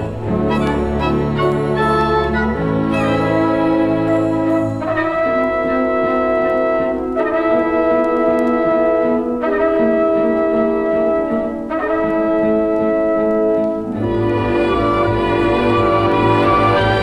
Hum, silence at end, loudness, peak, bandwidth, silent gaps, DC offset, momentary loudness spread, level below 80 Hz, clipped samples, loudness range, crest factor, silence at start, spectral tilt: none; 0 s; -16 LUFS; -2 dBFS; 11 kHz; none; under 0.1%; 4 LU; -34 dBFS; under 0.1%; 1 LU; 14 dB; 0 s; -8 dB/octave